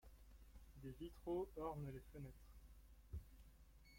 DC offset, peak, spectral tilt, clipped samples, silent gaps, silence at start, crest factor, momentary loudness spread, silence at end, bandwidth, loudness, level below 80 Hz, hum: under 0.1%; -34 dBFS; -8 dB/octave; under 0.1%; none; 0.05 s; 20 dB; 20 LU; 0 s; 16.5 kHz; -52 LUFS; -62 dBFS; none